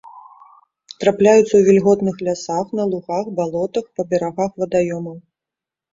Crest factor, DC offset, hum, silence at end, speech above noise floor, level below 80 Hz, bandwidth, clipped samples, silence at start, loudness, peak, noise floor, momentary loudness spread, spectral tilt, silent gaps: 16 dB; under 0.1%; none; 0.75 s; 70 dB; -56 dBFS; 7.8 kHz; under 0.1%; 0.05 s; -18 LUFS; -2 dBFS; -87 dBFS; 11 LU; -6 dB/octave; none